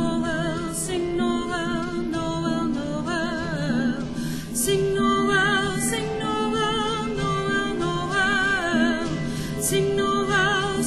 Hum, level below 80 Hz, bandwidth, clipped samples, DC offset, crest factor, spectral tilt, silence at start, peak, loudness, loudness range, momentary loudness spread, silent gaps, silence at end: none; -42 dBFS; 13.5 kHz; under 0.1%; under 0.1%; 14 dB; -4 dB/octave; 0 s; -10 dBFS; -24 LUFS; 3 LU; 7 LU; none; 0 s